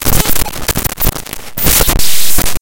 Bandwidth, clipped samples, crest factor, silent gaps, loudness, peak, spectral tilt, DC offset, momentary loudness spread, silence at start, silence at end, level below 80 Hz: over 20 kHz; 0.9%; 12 dB; none; -12 LUFS; 0 dBFS; -2.5 dB/octave; under 0.1%; 6 LU; 0 s; 0 s; -20 dBFS